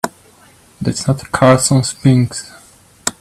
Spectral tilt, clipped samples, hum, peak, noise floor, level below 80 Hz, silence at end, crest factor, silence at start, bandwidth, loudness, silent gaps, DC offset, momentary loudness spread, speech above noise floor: -5 dB/octave; under 0.1%; none; 0 dBFS; -47 dBFS; -46 dBFS; 0.1 s; 16 dB; 0.05 s; 15 kHz; -15 LUFS; none; under 0.1%; 14 LU; 33 dB